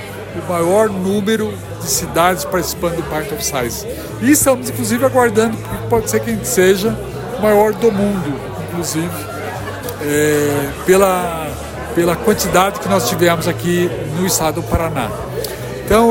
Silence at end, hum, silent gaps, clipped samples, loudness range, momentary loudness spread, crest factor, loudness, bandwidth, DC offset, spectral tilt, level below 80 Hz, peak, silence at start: 0 s; none; none; under 0.1%; 3 LU; 12 LU; 16 dB; -16 LUFS; 16.5 kHz; under 0.1%; -4.5 dB/octave; -36 dBFS; 0 dBFS; 0 s